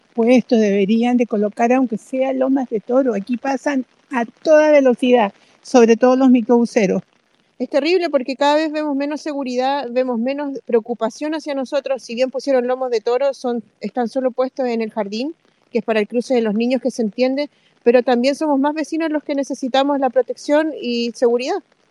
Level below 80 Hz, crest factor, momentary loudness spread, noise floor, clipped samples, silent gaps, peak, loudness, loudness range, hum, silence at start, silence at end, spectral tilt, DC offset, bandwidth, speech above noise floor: -72 dBFS; 18 dB; 10 LU; -42 dBFS; under 0.1%; none; 0 dBFS; -18 LUFS; 6 LU; none; 0.15 s; 0.3 s; -5.5 dB/octave; under 0.1%; 11 kHz; 24 dB